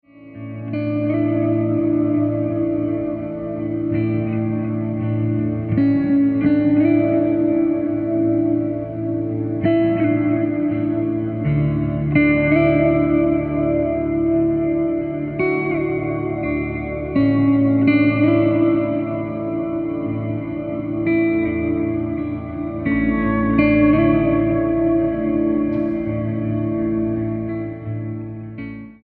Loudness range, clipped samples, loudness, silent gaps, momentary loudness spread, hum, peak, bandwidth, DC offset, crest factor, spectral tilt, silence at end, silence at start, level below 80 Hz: 4 LU; under 0.1%; -19 LUFS; none; 10 LU; none; -2 dBFS; 4.5 kHz; under 0.1%; 16 dB; -12 dB/octave; 0.1 s; 0.2 s; -40 dBFS